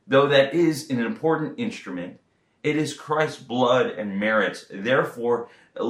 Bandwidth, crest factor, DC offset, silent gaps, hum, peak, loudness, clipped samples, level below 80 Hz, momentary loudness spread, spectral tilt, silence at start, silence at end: 14.5 kHz; 20 dB; under 0.1%; none; none; -4 dBFS; -23 LUFS; under 0.1%; -72 dBFS; 12 LU; -5.5 dB/octave; 0.1 s; 0 s